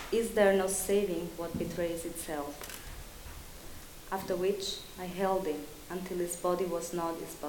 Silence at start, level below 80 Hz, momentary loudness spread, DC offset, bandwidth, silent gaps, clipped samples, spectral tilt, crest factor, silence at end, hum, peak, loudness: 0 s; -52 dBFS; 19 LU; under 0.1%; 18 kHz; none; under 0.1%; -4 dB/octave; 22 dB; 0 s; none; -12 dBFS; -33 LUFS